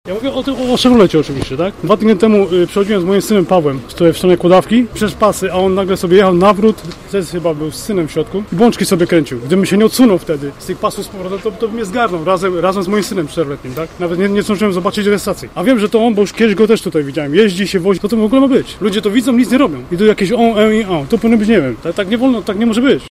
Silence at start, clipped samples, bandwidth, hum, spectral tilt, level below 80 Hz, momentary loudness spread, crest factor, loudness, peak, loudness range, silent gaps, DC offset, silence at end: 0.05 s; under 0.1%; 15.5 kHz; none; -6 dB/octave; -40 dBFS; 9 LU; 12 dB; -13 LUFS; 0 dBFS; 4 LU; none; under 0.1%; 0 s